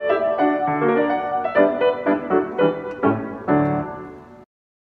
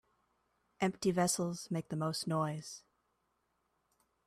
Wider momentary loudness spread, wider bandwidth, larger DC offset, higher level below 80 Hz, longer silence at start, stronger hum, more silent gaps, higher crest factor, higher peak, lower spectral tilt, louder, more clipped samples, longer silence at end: second, 8 LU vs 12 LU; second, 4.9 kHz vs 15 kHz; neither; first, -56 dBFS vs -74 dBFS; second, 0 s vs 0.8 s; neither; neither; about the same, 18 dB vs 20 dB; first, -2 dBFS vs -20 dBFS; first, -9 dB/octave vs -4.5 dB/octave; first, -20 LUFS vs -36 LUFS; neither; second, 0.55 s vs 1.5 s